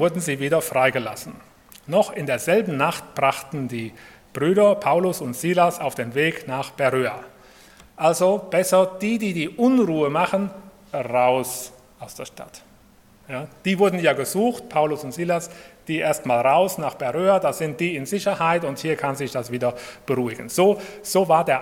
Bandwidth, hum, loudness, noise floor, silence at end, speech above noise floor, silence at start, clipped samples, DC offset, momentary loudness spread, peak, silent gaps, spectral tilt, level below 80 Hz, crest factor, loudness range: 17 kHz; none; -22 LUFS; -53 dBFS; 0 s; 31 dB; 0 s; under 0.1%; under 0.1%; 14 LU; -4 dBFS; none; -5 dB/octave; -62 dBFS; 18 dB; 3 LU